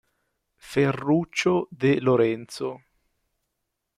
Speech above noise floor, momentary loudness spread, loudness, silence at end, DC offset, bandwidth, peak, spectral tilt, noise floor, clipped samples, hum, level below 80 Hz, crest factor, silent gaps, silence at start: 57 dB; 12 LU; -24 LUFS; 1.2 s; under 0.1%; 14 kHz; -10 dBFS; -6.5 dB/octave; -80 dBFS; under 0.1%; none; -62 dBFS; 16 dB; none; 0.65 s